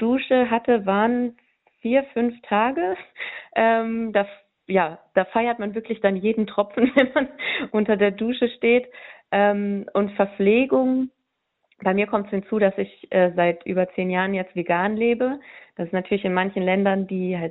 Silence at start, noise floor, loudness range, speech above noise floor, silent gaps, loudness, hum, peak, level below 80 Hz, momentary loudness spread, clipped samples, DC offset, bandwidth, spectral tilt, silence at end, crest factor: 0 s; -76 dBFS; 2 LU; 55 dB; none; -22 LUFS; none; -4 dBFS; -62 dBFS; 8 LU; under 0.1%; under 0.1%; 4.1 kHz; -9.5 dB/octave; 0 s; 18 dB